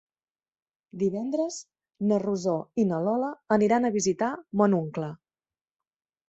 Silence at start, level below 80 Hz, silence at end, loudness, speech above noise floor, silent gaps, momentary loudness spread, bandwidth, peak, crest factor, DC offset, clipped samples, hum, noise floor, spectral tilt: 0.95 s; -68 dBFS; 1.15 s; -27 LUFS; over 64 dB; none; 10 LU; 8.2 kHz; -8 dBFS; 20 dB; under 0.1%; under 0.1%; none; under -90 dBFS; -6 dB/octave